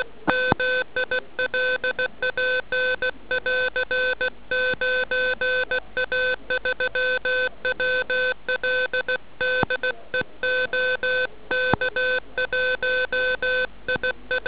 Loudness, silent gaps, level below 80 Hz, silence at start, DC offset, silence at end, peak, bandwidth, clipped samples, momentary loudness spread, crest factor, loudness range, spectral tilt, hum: -23 LUFS; none; -50 dBFS; 0 s; 1%; 0 s; 0 dBFS; 4 kHz; under 0.1%; 4 LU; 24 dB; 1 LU; -7 dB/octave; none